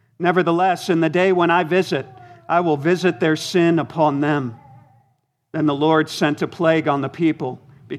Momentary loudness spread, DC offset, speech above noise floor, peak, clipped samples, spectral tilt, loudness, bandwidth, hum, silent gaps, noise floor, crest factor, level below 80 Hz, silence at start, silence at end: 8 LU; under 0.1%; 48 dB; -2 dBFS; under 0.1%; -6 dB/octave; -19 LUFS; 14 kHz; none; none; -66 dBFS; 18 dB; -68 dBFS; 0.2 s; 0 s